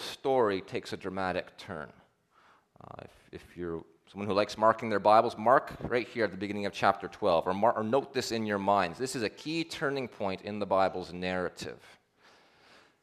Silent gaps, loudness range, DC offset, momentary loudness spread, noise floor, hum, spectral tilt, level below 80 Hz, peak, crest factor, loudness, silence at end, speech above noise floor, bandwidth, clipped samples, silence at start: none; 10 LU; under 0.1%; 17 LU; -65 dBFS; none; -5 dB/octave; -64 dBFS; -8 dBFS; 22 dB; -30 LUFS; 1.25 s; 34 dB; 13.5 kHz; under 0.1%; 0 s